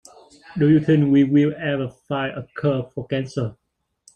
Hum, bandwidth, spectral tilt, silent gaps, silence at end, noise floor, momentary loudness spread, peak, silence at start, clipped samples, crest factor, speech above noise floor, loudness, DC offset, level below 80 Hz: none; 8.8 kHz; -8 dB/octave; none; 0.65 s; -58 dBFS; 12 LU; -6 dBFS; 0.5 s; under 0.1%; 16 dB; 38 dB; -21 LUFS; under 0.1%; -56 dBFS